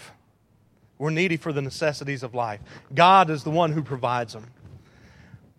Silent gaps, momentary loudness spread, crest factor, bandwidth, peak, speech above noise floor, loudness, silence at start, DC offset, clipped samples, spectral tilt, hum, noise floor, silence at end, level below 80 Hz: none; 15 LU; 24 dB; 13 kHz; 0 dBFS; 38 dB; -23 LUFS; 0 s; under 0.1%; under 0.1%; -5.5 dB/octave; none; -61 dBFS; 0.25 s; -62 dBFS